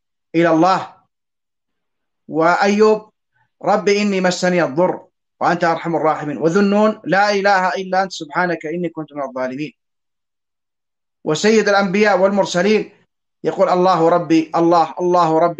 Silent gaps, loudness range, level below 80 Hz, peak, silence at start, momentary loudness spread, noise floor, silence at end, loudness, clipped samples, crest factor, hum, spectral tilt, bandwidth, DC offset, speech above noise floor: none; 5 LU; -66 dBFS; -2 dBFS; 0.35 s; 11 LU; -89 dBFS; 0.05 s; -16 LUFS; under 0.1%; 16 dB; none; -5.5 dB/octave; 8.6 kHz; under 0.1%; 73 dB